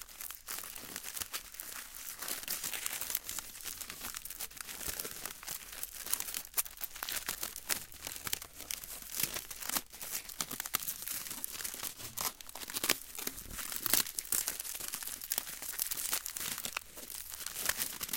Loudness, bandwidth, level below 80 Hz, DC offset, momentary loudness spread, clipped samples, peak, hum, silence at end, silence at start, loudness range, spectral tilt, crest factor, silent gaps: -37 LUFS; 17 kHz; -62 dBFS; under 0.1%; 9 LU; under 0.1%; -8 dBFS; none; 0 s; 0 s; 4 LU; 0 dB/octave; 32 dB; none